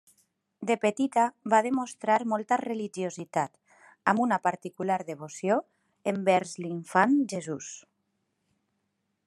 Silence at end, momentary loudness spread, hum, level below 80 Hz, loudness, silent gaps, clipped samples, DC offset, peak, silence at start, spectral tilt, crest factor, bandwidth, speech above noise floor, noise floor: 1.5 s; 11 LU; none; -82 dBFS; -28 LUFS; none; under 0.1%; under 0.1%; -6 dBFS; 0.6 s; -5 dB/octave; 24 dB; 12.5 kHz; 51 dB; -79 dBFS